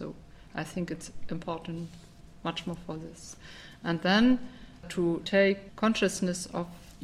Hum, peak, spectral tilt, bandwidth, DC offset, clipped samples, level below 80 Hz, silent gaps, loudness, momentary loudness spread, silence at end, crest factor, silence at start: none; -12 dBFS; -5 dB/octave; 14 kHz; under 0.1%; under 0.1%; -54 dBFS; none; -30 LUFS; 20 LU; 0 s; 18 dB; 0 s